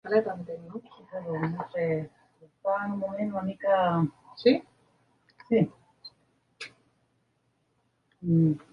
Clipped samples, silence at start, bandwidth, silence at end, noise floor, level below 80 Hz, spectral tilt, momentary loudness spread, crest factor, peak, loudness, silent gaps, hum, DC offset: under 0.1%; 0.05 s; 10.5 kHz; 0.15 s; -73 dBFS; -66 dBFS; -8.5 dB/octave; 19 LU; 20 dB; -10 dBFS; -28 LUFS; none; none; under 0.1%